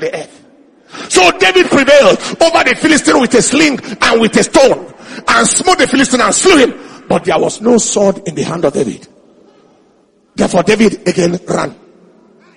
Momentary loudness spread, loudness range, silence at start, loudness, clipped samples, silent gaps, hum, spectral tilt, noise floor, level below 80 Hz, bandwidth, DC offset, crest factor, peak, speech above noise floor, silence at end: 12 LU; 7 LU; 0 s; -10 LUFS; 0.4%; none; none; -3 dB/octave; -51 dBFS; -42 dBFS; 14 kHz; under 0.1%; 12 dB; 0 dBFS; 41 dB; 0.85 s